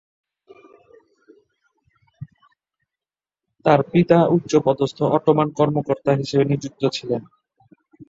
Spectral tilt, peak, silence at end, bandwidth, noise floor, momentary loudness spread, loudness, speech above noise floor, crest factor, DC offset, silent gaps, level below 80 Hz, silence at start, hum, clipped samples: -7 dB/octave; -2 dBFS; 0.85 s; 7.8 kHz; under -90 dBFS; 12 LU; -19 LUFS; over 72 dB; 20 dB; under 0.1%; none; -60 dBFS; 2.2 s; none; under 0.1%